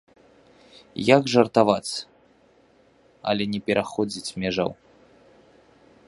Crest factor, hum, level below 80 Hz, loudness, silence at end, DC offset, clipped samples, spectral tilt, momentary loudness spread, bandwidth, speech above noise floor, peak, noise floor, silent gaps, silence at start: 24 dB; none; -60 dBFS; -23 LUFS; 1.35 s; under 0.1%; under 0.1%; -5 dB/octave; 14 LU; 11.5 kHz; 36 dB; -2 dBFS; -58 dBFS; none; 0.95 s